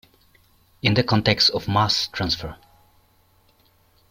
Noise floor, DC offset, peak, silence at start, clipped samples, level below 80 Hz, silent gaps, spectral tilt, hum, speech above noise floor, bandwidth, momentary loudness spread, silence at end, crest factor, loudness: -60 dBFS; under 0.1%; -2 dBFS; 0.85 s; under 0.1%; -50 dBFS; none; -4.5 dB/octave; none; 39 dB; 16.5 kHz; 8 LU; 1.55 s; 22 dB; -20 LUFS